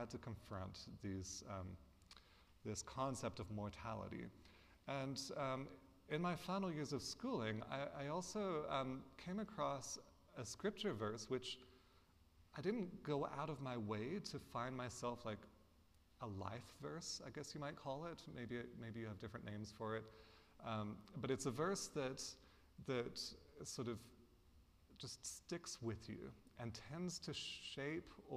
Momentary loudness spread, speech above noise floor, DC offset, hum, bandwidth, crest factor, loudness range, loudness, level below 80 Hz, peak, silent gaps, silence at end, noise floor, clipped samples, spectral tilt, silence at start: 11 LU; 24 dB; under 0.1%; none; 15.5 kHz; 20 dB; 5 LU; -48 LUFS; -72 dBFS; -28 dBFS; none; 0 s; -72 dBFS; under 0.1%; -4.5 dB/octave; 0 s